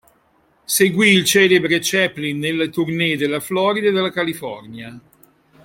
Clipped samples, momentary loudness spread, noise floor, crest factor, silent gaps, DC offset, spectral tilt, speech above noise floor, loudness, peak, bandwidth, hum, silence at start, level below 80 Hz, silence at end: under 0.1%; 17 LU; -59 dBFS; 18 dB; none; under 0.1%; -3.5 dB/octave; 41 dB; -17 LUFS; -2 dBFS; 16.5 kHz; none; 0.7 s; -60 dBFS; 0.65 s